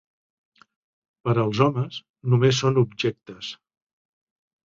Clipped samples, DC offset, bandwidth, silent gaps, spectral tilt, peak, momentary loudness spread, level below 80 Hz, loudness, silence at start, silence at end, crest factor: under 0.1%; under 0.1%; 7.6 kHz; 2.10-2.14 s; -6 dB/octave; -4 dBFS; 16 LU; -60 dBFS; -23 LUFS; 1.25 s; 1.15 s; 22 dB